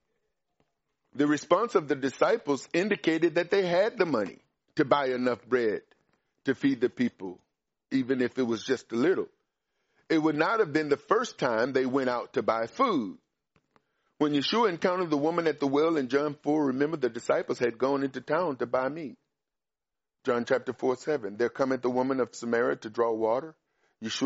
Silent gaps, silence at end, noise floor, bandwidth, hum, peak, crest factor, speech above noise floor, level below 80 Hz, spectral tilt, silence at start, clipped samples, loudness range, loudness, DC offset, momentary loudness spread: none; 0 s; under -90 dBFS; 8 kHz; none; -8 dBFS; 20 dB; over 63 dB; -74 dBFS; -4 dB/octave; 1.15 s; under 0.1%; 4 LU; -28 LUFS; under 0.1%; 6 LU